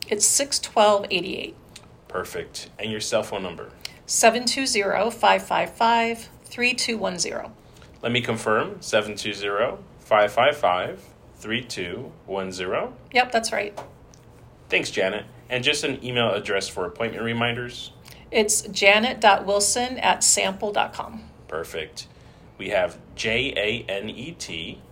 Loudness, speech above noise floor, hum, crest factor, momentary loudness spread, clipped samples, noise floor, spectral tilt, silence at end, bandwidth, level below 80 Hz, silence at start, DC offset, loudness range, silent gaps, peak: -23 LUFS; 25 dB; none; 24 dB; 17 LU; under 0.1%; -48 dBFS; -2 dB/octave; 0.1 s; 16 kHz; -54 dBFS; 0 s; under 0.1%; 7 LU; none; 0 dBFS